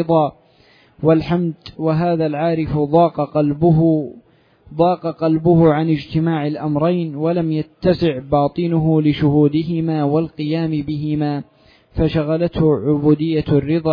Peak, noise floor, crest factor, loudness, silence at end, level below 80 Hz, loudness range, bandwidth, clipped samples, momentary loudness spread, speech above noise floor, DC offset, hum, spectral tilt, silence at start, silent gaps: -2 dBFS; -52 dBFS; 14 dB; -17 LUFS; 0 s; -42 dBFS; 2 LU; 5.2 kHz; under 0.1%; 7 LU; 35 dB; under 0.1%; none; -10.5 dB/octave; 0 s; none